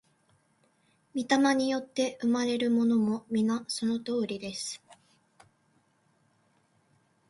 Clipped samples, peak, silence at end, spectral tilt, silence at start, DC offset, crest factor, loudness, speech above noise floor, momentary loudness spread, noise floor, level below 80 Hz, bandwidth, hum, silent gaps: under 0.1%; -12 dBFS; 2.35 s; -4.5 dB/octave; 1.15 s; under 0.1%; 20 dB; -29 LUFS; 41 dB; 11 LU; -69 dBFS; -74 dBFS; 11.5 kHz; none; none